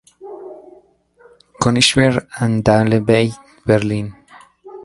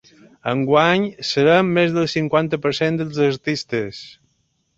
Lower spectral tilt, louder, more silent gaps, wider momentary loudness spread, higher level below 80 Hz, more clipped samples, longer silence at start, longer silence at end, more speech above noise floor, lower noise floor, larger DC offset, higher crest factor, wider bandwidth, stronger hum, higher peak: about the same, -5 dB/octave vs -6 dB/octave; about the same, -16 LUFS vs -18 LUFS; neither; first, 22 LU vs 10 LU; first, -44 dBFS vs -56 dBFS; neither; second, 0.2 s vs 0.45 s; second, 0.05 s vs 0.65 s; second, 36 dB vs 49 dB; second, -51 dBFS vs -67 dBFS; neither; about the same, 18 dB vs 18 dB; first, 11.5 kHz vs 8 kHz; neither; about the same, 0 dBFS vs -2 dBFS